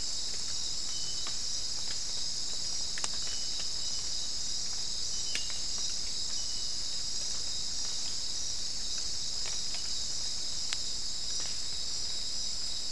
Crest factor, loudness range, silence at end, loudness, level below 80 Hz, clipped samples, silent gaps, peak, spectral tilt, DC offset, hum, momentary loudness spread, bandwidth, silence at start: 24 dB; 0 LU; 0 s; -33 LUFS; -52 dBFS; under 0.1%; none; -10 dBFS; 0.5 dB/octave; 2%; none; 1 LU; 12 kHz; 0 s